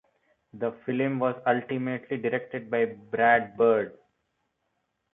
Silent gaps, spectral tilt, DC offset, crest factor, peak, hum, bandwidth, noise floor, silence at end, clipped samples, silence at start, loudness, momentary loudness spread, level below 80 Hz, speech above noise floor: none; -10 dB/octave; under 0.1%; 20 dB; -8 dBFS; none; 3.9 kHz; -78 dBFS; 1.2 s; under 0.1%; 0.55 s; -27 LUFS; 10 LU; -72 dBFS; 51 dB